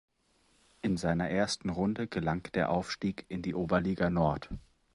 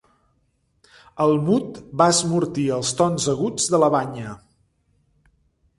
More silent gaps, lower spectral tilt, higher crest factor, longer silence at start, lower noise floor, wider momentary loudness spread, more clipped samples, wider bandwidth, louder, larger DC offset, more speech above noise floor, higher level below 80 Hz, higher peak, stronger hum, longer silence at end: neither; first, -6 dB/octave vs -4.5 dB/octave; about the same, 18 dB vs 20 dB; second, 0.85 s vs 1.15 s; about the same, -70 dBFS vs -67 dBFS; about the same, 9 LU vs 11 LU; neither; about the same, 11.5 kHz vs 11.5 kHz; second, -32 LUFS vs -20 LUFS; neither; second, 39 dB vs 47 dB; about the same, -52 dBFS vs -56 dBFS; second, -14 dBFS vs -2 dBFS; neither; second, 0.35 s vs 1.4 s